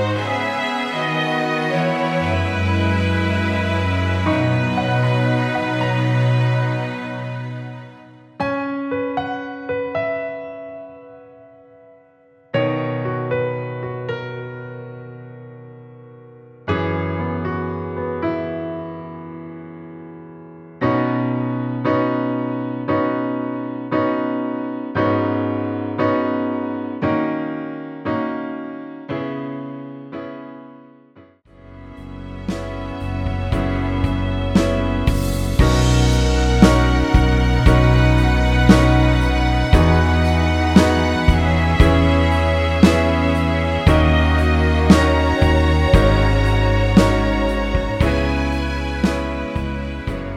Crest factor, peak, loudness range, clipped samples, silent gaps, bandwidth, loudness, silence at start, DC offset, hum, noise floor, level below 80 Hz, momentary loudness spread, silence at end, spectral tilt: 18 dB; 0 dBFS; 13 LU; under 0.1%; none; 15 kHz; -19 LUFS; 0 s; under 0.1%; none; -52 dBFS; -24 dBFS; 17 LU; 0 s; -6.5 dB/octave